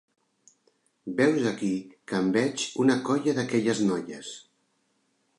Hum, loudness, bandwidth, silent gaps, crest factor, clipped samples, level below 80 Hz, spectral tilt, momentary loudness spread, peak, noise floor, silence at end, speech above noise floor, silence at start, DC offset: none; -26 LUFS; 11.5 kHz; none; 18 dB; under 0.1%; -70 dBFS; -5 dB/octave; 15 LU; -10 dBFS; -72 dBFS; 1 s; 46 dB; 1.05 s; under 0.1%